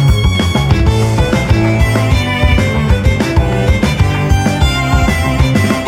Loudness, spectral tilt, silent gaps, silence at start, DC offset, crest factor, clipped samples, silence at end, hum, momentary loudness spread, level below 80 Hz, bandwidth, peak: -12 LUFS; -6 dB/octave; none; 0 s; under 0.1%; 10 dB; under 0.1%; 0 s; none; 1 LU; -16 dBFS; 16 kHz; 0 dBFS